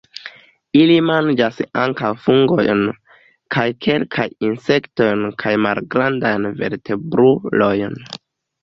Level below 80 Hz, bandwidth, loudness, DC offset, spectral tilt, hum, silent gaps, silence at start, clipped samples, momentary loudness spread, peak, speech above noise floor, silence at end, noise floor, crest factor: -54 dBFS; 7.4 kHz; -17 LUFS; under 0.1%; -7.5 dB/octave; none; none; 0.15 s; under 0.1%; 11 LU; 0 dBFS; 29 dB; 0.45 s; -46 dBFS; 16 dB